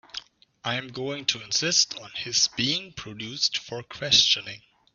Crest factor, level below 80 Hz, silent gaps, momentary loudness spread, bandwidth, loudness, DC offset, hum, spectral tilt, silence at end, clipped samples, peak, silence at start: 24 dB; -62 dBFS; none; 19 LU; 7.6 kHz; -23 LUFS; under 0.1%; none; -1 dB/octave; 0.35 s; under 0.1%; -4 dBFS; 0.15 s